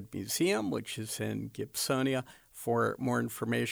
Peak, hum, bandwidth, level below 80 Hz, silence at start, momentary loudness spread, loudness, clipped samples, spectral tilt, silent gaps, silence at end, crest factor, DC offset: -18 dBFS; none; over 20 kHz; -68 dBFS; 0 s; 8 LU; -33 LUFS; under 0.1%; -4.5 dB/octave; none; 0 s; 14 dB; under 0.1%